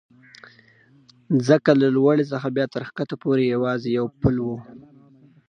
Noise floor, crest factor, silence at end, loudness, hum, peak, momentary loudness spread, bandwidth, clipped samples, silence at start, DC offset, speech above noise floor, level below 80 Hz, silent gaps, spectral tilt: -55 dBFS; 20 dB; 0.7 s; -21 LUFS; none; -2 dBFS; 11 LU; 9.4 kHz; under 0.1%; 1.3 s; under 0.1%; 34 dB; -48 dBFS; none; -7.5 dB/octave